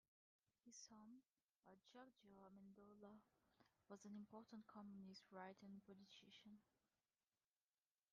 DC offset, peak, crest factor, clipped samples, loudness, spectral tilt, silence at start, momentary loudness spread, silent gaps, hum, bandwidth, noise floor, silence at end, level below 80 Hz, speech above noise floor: under 0.1%; -44 dBFS; 22 dB; under 0.1%; -64 LUFS; -4.5 dB/octave; 0.65 s; 8 LU; 1.43-1.63 s; none; 7 kHz; under -90 dBFS; 1.5 s; under -90 dBFS; over 27 dB